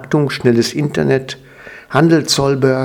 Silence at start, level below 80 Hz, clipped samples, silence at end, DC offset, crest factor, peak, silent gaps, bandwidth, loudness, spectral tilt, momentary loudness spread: 0 s; -48 dBFS; under 0.1%; 0 s; under 0.1%; 14 dB; 0 dBFS; none; 17.5 kHz; -14 LUFS; -5.5 dB/octave; 7 LU